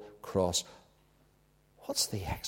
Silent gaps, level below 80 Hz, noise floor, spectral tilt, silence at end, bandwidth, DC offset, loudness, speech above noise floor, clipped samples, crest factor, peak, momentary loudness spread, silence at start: none; -54 dBFS; -67 dBFS; -3.5 dB/octave; 0 s; 16.5 kHz; under 0.1%; -32 LUFS; 34 dB; under 0.1%; 22 dB; -16 dBFS; 16 LU; 0 s